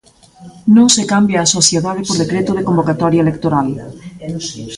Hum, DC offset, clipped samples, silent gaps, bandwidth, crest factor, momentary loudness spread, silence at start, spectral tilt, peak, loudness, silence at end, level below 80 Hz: none; under 0.1%; under 0.1%; none; 11.5 kHz; 14 dB; 14 LU; 0.4 s; -4 dB/octave; 0 dBFS; -13 LUFS; 0 s; -46 dBFS